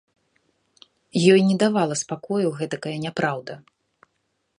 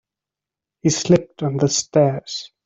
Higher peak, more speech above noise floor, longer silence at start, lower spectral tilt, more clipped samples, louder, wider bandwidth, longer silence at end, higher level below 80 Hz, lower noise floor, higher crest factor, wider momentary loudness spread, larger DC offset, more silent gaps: about the same, -2 dBFS vs -2 dBFS; second, 52 dB vs 69 dB; first, 1.15 s vs 0.85 s; about the same, -5.5 dB/octave vs -5 dB/octave; neither; second, -22 LUFS vs -19 LUFS; first, 11 kHz vs 8 kHz; first, 1 s vs 0.2 s; second, -70 dBFS vs -56 dBFS; second, -73 dBFS vs -88 dBFS; about the same, 22 dB vs 18 dB; first, 14 LU vs 9 LU; neither; neither